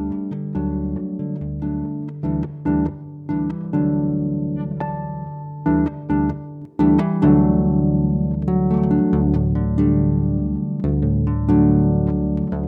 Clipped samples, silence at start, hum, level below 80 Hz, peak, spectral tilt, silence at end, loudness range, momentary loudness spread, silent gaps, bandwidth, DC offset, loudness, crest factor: under 0.1%; 0 s; none; -30 dBFS; -2 dBFS; -12 dB/octave; 0 s; 6 LU; 11 LU; none; 3.8 kHz; under 0.1%; -20 LUFS; 16 dB